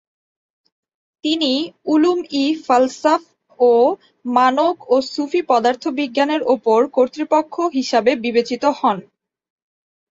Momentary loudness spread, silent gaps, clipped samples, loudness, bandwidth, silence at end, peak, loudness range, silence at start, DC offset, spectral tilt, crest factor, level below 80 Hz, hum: 6 LU; none; under 0.1%; -17 LUFS; 7.8 kHz; 1.1 s; -2 dBFS; 2 LU; 1.25 s; under 0.1%; -4 dB/octave; 16 dB; -66 dBFS; none